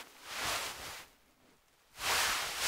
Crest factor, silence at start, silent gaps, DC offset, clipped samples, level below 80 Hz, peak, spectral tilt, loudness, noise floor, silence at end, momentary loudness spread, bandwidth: 20 dB; 0 s; none; under 0.1%; under 0.1%; -64 dBFS; -18 dBFS; 0.5 dB/octave; -34 LUFS; -67 dBFS; 0 s; 15 LU; 16 kHz